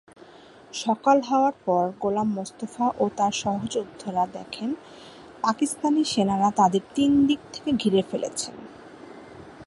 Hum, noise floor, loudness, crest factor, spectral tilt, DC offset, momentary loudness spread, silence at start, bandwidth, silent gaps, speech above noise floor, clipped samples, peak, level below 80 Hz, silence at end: none; -49 dBFS; -24 LUFS; 18 dB; -5 dB/octave; under 0.1%; 23 LU; 0.75 s; 11.5 kHz; none; 25 dB; under 0.1%; -6 dBFS; -60 dBFS; 0.05 s